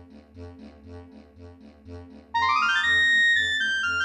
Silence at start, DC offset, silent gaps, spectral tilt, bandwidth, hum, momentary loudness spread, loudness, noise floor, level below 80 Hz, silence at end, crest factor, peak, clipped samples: 0.15 s; under 0.1%; none; -1 dB/octave; 11 kHz; none; 16 LU; -20 LUFS; -47 dBFS; -56 dBFS; 0 s; 14 dB; -12 dBFS; under 0.1%